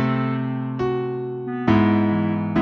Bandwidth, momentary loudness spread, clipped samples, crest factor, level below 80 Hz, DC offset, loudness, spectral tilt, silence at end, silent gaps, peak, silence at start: 6.2 kHz; 9 LU; under 0.1%; 18 dB; -50 dBFS; under 0.1%; -22 LUFS; -9.5 dB/octave; 0 s; none; -4 dBFS; 0 s